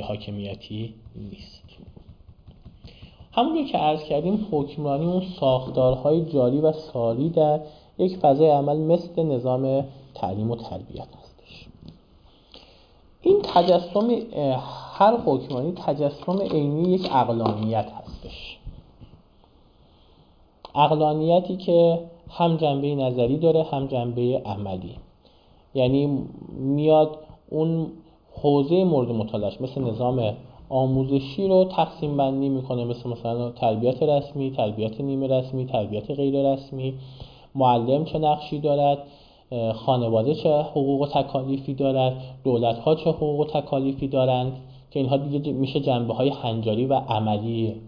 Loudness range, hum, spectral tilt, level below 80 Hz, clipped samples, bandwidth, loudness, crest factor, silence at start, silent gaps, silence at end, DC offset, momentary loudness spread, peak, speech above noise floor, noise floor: 5 LU; none; -9.5 dB/octave; -52 dBFS; under 0.1%; 5.2 kHz; -23 LUFS; 18 dB; 0 s; none; 0 s; under 0.1%; 14 LU; -6 dBFS; 33 dB; -55 dBFS